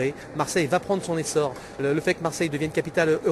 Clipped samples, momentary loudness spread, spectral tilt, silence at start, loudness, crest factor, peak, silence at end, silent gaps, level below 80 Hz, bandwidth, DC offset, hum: under 0.1%; 6 LU; -5 dB/octave; 0 s; -25 LUFS; 16 dB; -8 dBFS; 0 s; none; -54 dBFS; 13 kHz; under 0.1%; none